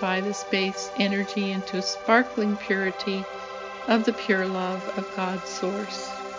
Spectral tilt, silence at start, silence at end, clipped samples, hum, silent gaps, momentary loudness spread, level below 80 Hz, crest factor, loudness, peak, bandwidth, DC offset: -4.5 dB/octave; 0 s; 0 s; under 0.1%; none; none; 10 LU; -64 dBFS; 20 dB; -26 LUFS; -6 dBFS; 7.6 kHz; under 0.1%